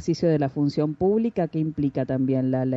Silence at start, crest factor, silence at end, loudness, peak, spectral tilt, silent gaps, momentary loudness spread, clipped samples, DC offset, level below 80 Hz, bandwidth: 0 s; 12 dB; 0 s; -24 LUFS; -10 dBFS; -8.5 dB/octave; none; 3 LU; under 0.1%; under 0.1%; -54 dBFS; 7.8 kHz